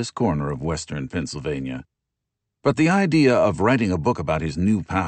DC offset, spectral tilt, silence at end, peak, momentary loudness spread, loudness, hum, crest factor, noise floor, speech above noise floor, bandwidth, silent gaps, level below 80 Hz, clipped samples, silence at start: under 0.1%; -6.5 dB/octave; 0 s; -6 dBFS; 11 LU; -21 LUFS; none; 16 dB; -82 dBFS; 61 dB; 8.8 kHz; none; -44 dBFS; under 0.1%; 0 s